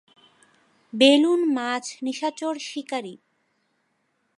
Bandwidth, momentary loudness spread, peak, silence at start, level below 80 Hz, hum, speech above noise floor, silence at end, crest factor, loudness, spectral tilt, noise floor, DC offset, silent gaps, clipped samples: 11.5 kHz; 15 LU; -4 dBFS; 0.95 s; -78 dBFS; none; 49 dB; 1.2 s; 20 dB; -22 LUFS; -3 dB/octave; -71 dBFS; under 0.1%; none; under 0.1%